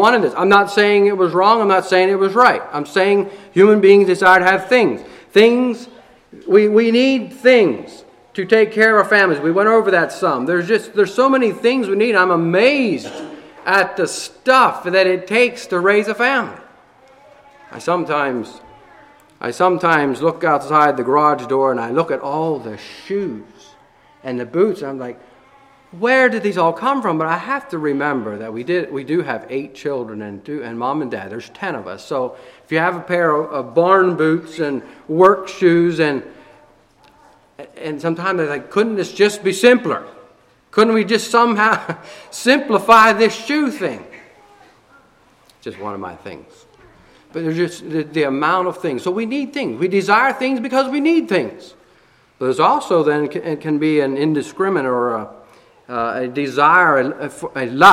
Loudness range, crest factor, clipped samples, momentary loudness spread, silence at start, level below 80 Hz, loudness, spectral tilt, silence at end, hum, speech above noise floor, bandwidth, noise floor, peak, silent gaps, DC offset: 10 LU; 16 dB; under 0.1%; 15 LU; 0 s; -62 dBFS; -16 LUFS; -5 dB/octave; 0 s; none; 37 dB; 15 kHz; -53 dBFS; 0 dBFS; none; under 0.1%